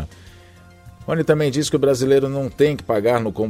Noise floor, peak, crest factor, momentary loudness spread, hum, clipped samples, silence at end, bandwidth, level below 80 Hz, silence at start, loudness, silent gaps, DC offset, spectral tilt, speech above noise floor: -46 dBFS; -2 dBFS; 18 dB; 8 LU; none; under 0.1%; 0 s; 15.5 kHz; -46 dBFS; 0 s; -19 LUFS; none; under 0.1%; -6 dB/octave; 28 dB